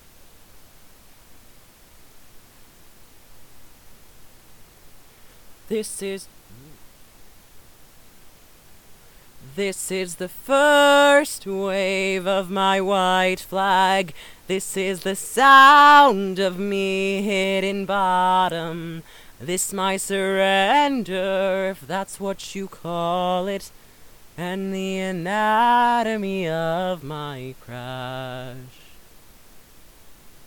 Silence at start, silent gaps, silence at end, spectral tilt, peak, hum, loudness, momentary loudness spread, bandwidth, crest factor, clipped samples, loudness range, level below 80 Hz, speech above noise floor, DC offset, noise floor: 0.2 s; none; 0 s; -3.5 dB/octave; 0 dBFS; none; -20 LUFS; 18 LU; 19 kHz; 22 dB; under 0.1%; 19 LU; -56 dBFS; 29 dB; under 0.1%; -49 dBFS